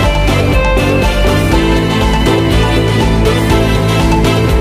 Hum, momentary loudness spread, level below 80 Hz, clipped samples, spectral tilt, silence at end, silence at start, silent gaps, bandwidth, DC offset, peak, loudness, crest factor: none; 1 LU; -16 dBFS; under 0.1%; -6 dB/octave; 0 s; 0 s; none; 15.5 kHz; under 0.1%; 0 dBFS; -11 LUFS; 10 dB